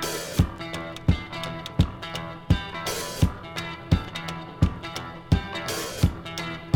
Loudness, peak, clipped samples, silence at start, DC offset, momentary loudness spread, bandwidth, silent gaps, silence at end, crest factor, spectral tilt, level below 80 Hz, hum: -28 LUFS; -6 dBFS; under 0.1%; 0 s; under 0.1%; 8 LU; over 20 kHz; none; 0 s; 20 dB; -5 dB/octave; -36 dBFS; none